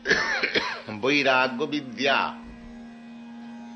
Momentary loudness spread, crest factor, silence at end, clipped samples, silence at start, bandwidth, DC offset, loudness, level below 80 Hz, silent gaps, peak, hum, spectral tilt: 22 LU; 20 dB; 0 s; under 0.1%; 0 s; 8.6 kHz; under 0.1%; -24 LUFS; -58 dBFS; none; -8 dBFS; none; -3.5 dB/octave